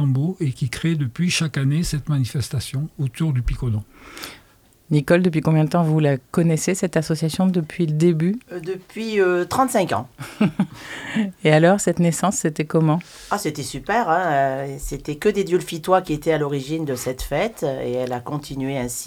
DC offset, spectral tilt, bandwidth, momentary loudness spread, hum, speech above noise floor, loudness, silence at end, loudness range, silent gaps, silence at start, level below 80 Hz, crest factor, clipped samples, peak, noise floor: under 0.1%; -6 dB/octave; 16.5 kHz; 10 LU; none; 33 dB; -21 LUFS; 0 s; 4 LU; none; 0 s; -42 dBFS; 20 dB; under 0.1%; 0 dBFS; -54 dBFS